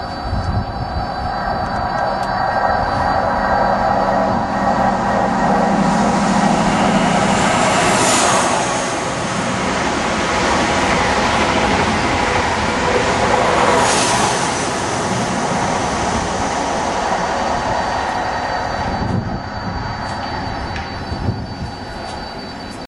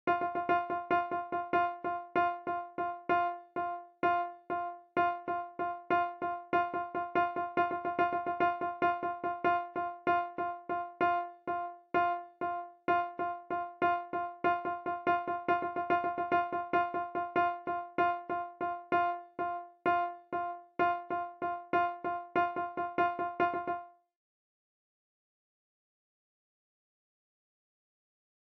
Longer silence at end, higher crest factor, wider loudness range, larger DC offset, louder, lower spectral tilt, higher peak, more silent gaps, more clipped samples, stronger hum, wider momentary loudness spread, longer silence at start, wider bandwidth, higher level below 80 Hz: second, 0 s vs 4.7 s; about the same, 16 dB vs 16 dB; first, 7 LU vs 2 LU; neither; first, -17 LUFS vs -34 LUFS; second, -4 dB/octave vs -7.5 dB/octave; first, -2 dBFS vs -18 dBFS; neither; neither; neither; first, 10 LU vs 6 LU; about the same, 0 s vs 0.05 s; first, 12.5 kHz vs 6 kHz; first, -34 dBFS vs -72 dBFS